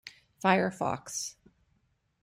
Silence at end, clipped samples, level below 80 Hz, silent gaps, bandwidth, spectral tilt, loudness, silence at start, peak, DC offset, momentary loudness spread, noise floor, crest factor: 0.9 s; under 0.1%; -70 dBFS; none; 16 kHz; -4 dB/octave; -30 LUFS; 0.05 s; -10 dBFS; under 0.1%; 13 LU; -73 dBFS; 22 dB